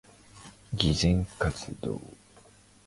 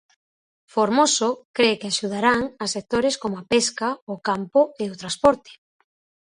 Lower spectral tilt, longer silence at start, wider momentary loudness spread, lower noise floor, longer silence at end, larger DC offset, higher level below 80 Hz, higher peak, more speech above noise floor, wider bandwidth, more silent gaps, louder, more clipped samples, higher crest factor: first, -5 dB/octave vs -3 dB/octave; second, 0.35 s vs 0.75 s; first, 25 LU vs 9 LU; second, -57 dBFS vs under -90 dBFS; about the same, 0.75 s vs 0.8 s; neither; first, -42 dBFS vs -56 dBFS; about the same, -6 dBFS vs -4 dBFS; second, 29 dB vs over 68 dB; about the same, 11.5 kHz vs 11 kHz; second, none vs 1.45-1.54 s, 4.02-4.07 s; second, -29 LUFS vs -22 LUFS; neither; about the same, 24 dB vs 20 dB